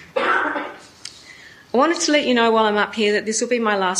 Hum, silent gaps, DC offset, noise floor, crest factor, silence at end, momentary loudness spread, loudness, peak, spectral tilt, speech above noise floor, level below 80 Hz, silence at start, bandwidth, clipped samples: none; none; under 0.1%; -44 dBFS; 16 dB; 0 s; 20 LU; -18 LUFS; -4 dBFS; -2.5 dB/octave; 26 dB; -64 dBFS; 0 s; 12 kHz; under 0.1%